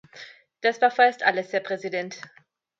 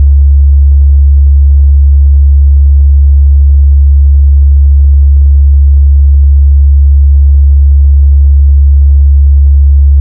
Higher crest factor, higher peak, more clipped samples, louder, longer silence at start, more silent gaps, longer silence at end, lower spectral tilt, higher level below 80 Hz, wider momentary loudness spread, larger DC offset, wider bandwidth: first, 20 dB vs 4 dB; second, -4 dBFS vs 0 dBFS; second, under 0.1% vs 7%; second, -23 LUFS vs -6 LUFS; first, 0.15 s vs 0 s; neither; first, 0.6 s vs 0 s; second, -3.5 dB/octave vs -14.5 dB/octave; second, -82 dBFS vs -4 dBFS; first, 22 LU vs 0 LU; neither; first, 7.6 kHz vs 0.6 kHz